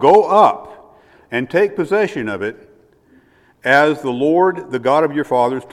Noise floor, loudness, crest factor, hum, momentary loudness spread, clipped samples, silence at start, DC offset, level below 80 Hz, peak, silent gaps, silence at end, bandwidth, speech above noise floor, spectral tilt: -52 dBFS; -16 LUFS; 16 dB; none; 12 LU; under 0.1%; 0 s; under 0.1%; -60 dBFS; 0 dBFS; none; 0.05 s; 12.5 kHz; 37 dB; -6 dB/octave